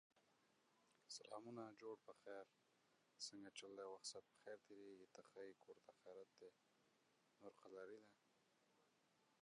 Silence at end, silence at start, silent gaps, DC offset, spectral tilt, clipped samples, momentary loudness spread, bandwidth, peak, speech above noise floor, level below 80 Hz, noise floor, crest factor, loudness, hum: 0.05 s; 0.15 s; none; under 0.1%; -2.5 dB/octave; under 0.1%; 11 LU; 10 kHz; -40 dBFS; 22 dB; under -90 dBFS; -83 dBFS; 22 dB; -60 LUFS; none